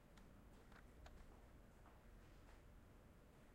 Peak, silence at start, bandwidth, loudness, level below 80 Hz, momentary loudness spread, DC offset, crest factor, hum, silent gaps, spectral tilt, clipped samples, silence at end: -46 dBFS; 0 s; 16 kHz; -67 LUFS; -68 dBFS; 3 LU; under 0.1%; 18 dB; none; none; -5.5 dB/octave; under 0.1%; 0 s